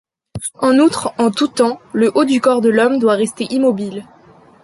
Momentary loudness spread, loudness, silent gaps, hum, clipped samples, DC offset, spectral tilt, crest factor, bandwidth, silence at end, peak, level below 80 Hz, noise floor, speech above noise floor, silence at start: 14 LU; -15 LUFS; none; none; under 0.1%; under 0.1%; -4.5 dB/octave; 14 dB; 11.5 kHz; 0.6 s; -2 dBFS; -54 dBFS; -46 dBFS; 31 dB; 0.35 s